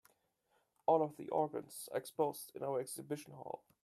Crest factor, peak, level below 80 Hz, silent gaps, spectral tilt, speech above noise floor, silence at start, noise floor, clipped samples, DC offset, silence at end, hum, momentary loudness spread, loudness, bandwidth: 22 dB; -18 dBFS; -86 dBFS; none; -5 dB/octave; 40 dB; 0.9 s; -79 dBFS; under 0.1%; under 0.1%; 0.3 s; none; 12 LU; -39 LUFS; 15 kHz